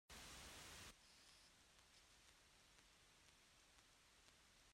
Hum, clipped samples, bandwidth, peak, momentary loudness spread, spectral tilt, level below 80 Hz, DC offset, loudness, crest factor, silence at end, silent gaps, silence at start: none; under 0.1%; 16 kHz; -46 dBFS; 11 LU; -1.5 dB/octave; -76 dBFS; under 0.1%; -62 LUFS; 20 dB; 0 s; none; 0.1 s